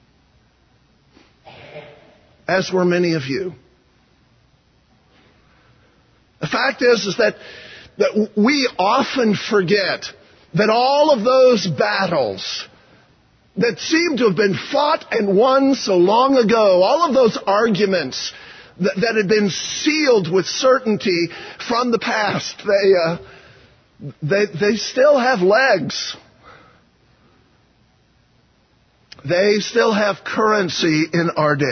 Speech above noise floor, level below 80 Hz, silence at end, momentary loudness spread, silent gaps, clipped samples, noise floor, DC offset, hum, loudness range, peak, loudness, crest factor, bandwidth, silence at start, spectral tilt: 41 dB; -60 dBFS; 0 s; 14 LU; none; under 0.1%; -58 dBFS; under 0.1%; none; 8 LU; -2 dBFS; -17 LUFS; 16 dB; 6.6 kHz; 1.45 s; -4.5 dB/octave